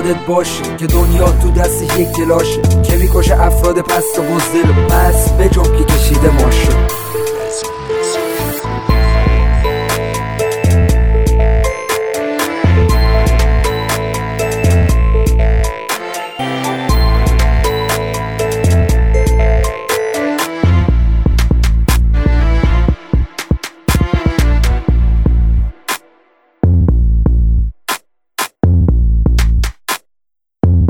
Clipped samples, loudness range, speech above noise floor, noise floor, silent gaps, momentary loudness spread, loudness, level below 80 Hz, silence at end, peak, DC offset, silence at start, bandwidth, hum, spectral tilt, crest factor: under 0.1%; 4 LU; 59 dB; -70 dBFS; none; 7 LU; -13 LUFS; -14 dBFS; 0 s; 0 dBFS; under 0.1%; 0 s; over 20 kHz; none; -5.5 dB/octave; 12 dB